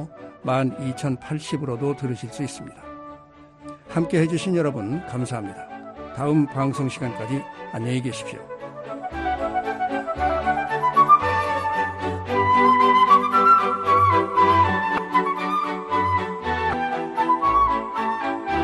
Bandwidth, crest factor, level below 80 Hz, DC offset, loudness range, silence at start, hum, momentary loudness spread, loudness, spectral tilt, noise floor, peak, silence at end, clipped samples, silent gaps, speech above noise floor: 12.5 kHz; 18 dB; -48 dBFS; under 0.1%; 10 LU; 0 s; none; 19 LU; -21 LUFS; -6 dB/octave; -47 dBFS; -4 dBFS; 0 s; under 0.1%; none; 22 dB